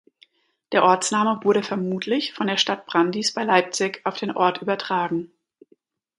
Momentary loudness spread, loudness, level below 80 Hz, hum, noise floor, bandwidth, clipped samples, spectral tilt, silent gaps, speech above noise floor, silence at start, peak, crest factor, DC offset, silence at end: 8 LU; -22 LUFS; -72 dBFS; none; -62 dBFS; 11.5 kHz; under 0.1%; -3.5 dB/octave; none; 41 dB; 0.7 s; -2 dBFS; 22 dB; under 0.1%; 0.9 s